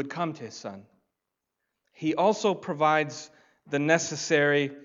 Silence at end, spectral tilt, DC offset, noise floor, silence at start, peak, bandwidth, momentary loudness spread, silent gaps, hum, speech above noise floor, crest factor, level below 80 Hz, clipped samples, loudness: 0 s; -4.5 dB/octave; under 0.1%; -85 dBFS; 0 s; -6 dBFS; 7.8 kHz; 15 LU; none; none; 58 dB; 22 dB; -78 dBFS; under 0.1%; -26 LUFS